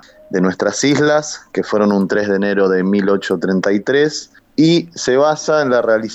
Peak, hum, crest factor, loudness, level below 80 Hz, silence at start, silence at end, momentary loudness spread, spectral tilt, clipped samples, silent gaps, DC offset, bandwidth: -4 dBFS; none; 12 dB; -15 LUFS; -58 dBFS; 0.3 s; 0 s; 5 LU; -5 dB/octave; under 0.1%; none; under 0.1%; 8.4 kHz